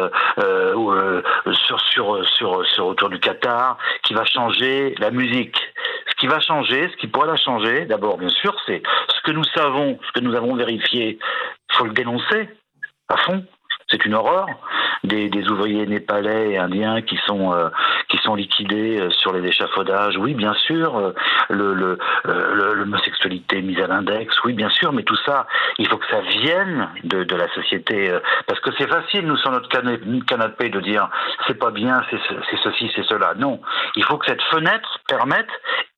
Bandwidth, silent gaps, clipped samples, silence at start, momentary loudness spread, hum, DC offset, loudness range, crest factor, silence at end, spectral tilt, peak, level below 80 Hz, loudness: 10.5 kHz; none; under 0.1%; 0 s; 5 LU; none; under 0.1%; 3 LU; 18 dB; 0.1 s; -6 dB/octave; -2 dBFS; -68 dBFS; -19 LUFS